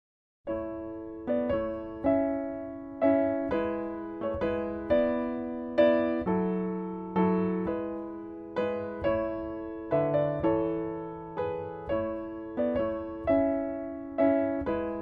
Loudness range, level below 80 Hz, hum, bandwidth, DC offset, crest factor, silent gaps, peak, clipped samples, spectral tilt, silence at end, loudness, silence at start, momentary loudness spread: 3 LU; -54 dBFS; none; 5.2 kHz; under 0.1%; 18 dB; none; -12 dBFS; under 0.1%; -10 dB/octave; 0 s; -30 LUFS; 0.45 s; 11 LU